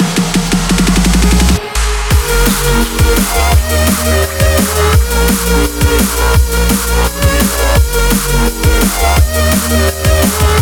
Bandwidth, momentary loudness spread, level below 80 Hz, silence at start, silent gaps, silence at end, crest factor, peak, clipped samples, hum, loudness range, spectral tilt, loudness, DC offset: over 20 kHz; 2 LU; -14 dBFS; 0 s; none; 0 s; 10 dB; 0 dBFS; under 0.1%; none; 1 LU; -4.5 dB/octave; -11 LUFS; under 0.1%